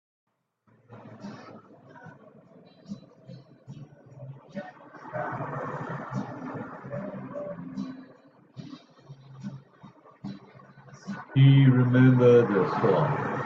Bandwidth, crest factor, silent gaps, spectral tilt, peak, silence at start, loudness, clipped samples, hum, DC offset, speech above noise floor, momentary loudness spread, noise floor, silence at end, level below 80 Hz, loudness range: 6.2 kHz; 20 dB; none; -9.5 dB/octave; -8 dBFS; 0.9 s; -24 LUFS; under 0.1%; none; under 0.1%; 47 dB; 28 LU; -66 dBFS; 0 s; -68 dBFS; 25 LU